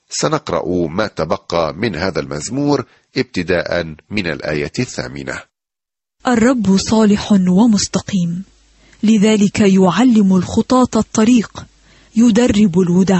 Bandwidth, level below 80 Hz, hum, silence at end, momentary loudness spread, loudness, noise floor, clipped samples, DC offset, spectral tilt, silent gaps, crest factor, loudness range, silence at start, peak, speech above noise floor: 8.6 kHz; -42 dBFS; none; 0 s; 11 LU; -15 LUFS; -87 dBFS; under 0.1%; under 0.1%; -5.5 dB/octave; none; 12 dB; 7 LU; 0.1 s; -2 dBFS; 73 dB